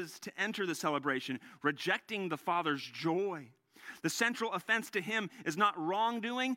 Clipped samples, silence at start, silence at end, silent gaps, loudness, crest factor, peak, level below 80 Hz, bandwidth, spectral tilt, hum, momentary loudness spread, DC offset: under 0.1%; 0 s; 0 s; none; -34 LUFS; 20 dB; -14 dBFS; -86 dBFS; 16.5 kHz; -3.5 dB/octave; none; 8 LU; under 0.1%